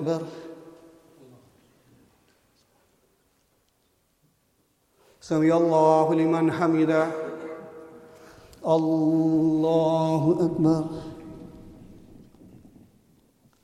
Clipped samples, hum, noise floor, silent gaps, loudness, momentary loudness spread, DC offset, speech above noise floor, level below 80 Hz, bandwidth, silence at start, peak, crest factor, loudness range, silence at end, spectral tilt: under 0.1%; none; -68 dBFS; none; -23 LUFS; 23 LU; under 0.1%; 47 dB; -62 dBFS; 10.5 kHz; 0 s; -8 dBFS; 18 dB; 7 LU; 1.7 s; -8 dB/octave